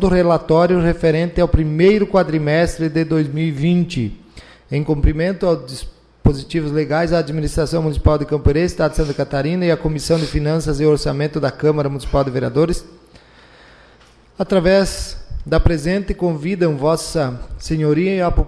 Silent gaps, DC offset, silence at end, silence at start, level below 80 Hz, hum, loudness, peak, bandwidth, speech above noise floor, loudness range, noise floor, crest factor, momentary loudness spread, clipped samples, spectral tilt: none; under 0.1%; 0 s; 0 s; -26 dBFS; none; -18 LUFS; -4 dBFS; 11 kHz; 32 dB; 4 LU; -48 dBFS; 14 dB; 8 LU; under 0.1%; -7 dB/octave